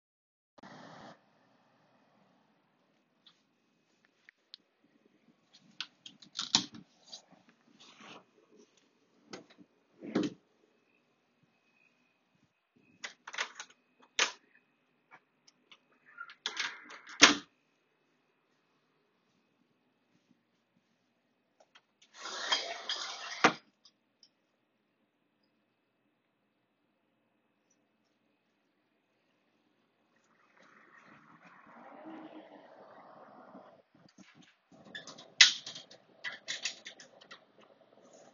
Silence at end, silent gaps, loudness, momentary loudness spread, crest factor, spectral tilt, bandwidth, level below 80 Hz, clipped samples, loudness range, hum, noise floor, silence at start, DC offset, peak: 1 s; none; -30 LUFS; 32 LU; 38 dB; 1 dB/octave; 7.2 kHz; -84 dBFS; under 0.1%; 23 LU; none; -78 dBFS; 0.65 s; under 0.1%; -2 dBFS